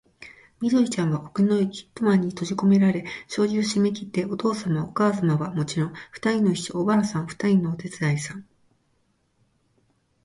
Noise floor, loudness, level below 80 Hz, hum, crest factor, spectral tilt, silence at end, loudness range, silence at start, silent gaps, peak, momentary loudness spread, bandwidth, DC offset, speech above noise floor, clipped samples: -68 dBFS; -24 LUFS; -62 dBFS; none; 16 dB; -6.5 dB/octave; 1.8 s; 3 LU; 0.2 s; none; -8 dBFS; 7 LU; 11.5 kHz; under 0.1%; 45 dB; under 0.1%